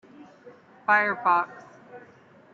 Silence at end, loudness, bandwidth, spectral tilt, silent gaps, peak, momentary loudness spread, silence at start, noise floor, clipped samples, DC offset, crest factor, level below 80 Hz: 0.55 s; -24 LUFS; 7.4 kHz; -5.5 dB/octave; none; -8 dBFS; 13 LU; 0.2 s; -54 dBFS; under 0.1%; under 0.1%; 20 dB; -80 dBFS